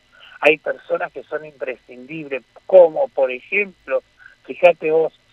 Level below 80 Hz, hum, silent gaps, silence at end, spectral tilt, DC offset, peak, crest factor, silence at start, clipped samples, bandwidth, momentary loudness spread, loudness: -66 dBFS; none; none; 0.25 s; -5.5 dB/octave; under 0.1%; 0 dBFS; 20 dB; 0.4 s; under 0.1%; 6 kHz; 17 LU; -18 LUFS